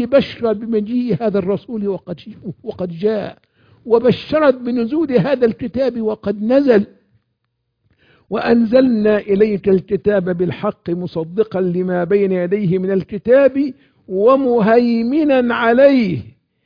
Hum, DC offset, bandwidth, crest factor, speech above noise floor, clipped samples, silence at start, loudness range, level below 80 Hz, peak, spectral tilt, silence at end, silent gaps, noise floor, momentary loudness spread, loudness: none; under 0.1%; 5.2 kHz; 16 dB; 56 dB; under 0.1%; 0 s; 5 LU; -52 dBFS; 0 dBFS; -9.5 dB/octave; 0.35 s; none; -71 dBFS; 11 LU; -16 LUFS